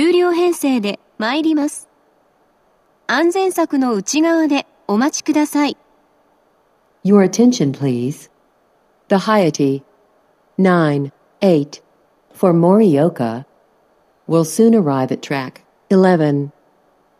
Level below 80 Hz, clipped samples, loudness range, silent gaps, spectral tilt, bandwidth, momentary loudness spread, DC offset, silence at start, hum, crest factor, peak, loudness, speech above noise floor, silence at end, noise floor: -70 dBFS; under 0.1%; 3 LU; none; -6 dB/octave; 14.5 kHz; 12 LU; under 0.1%; 0 s; none; 16 dB; 0 dBFS; -16 LUFS; 43 dB; 0.7 s; -58 dBFS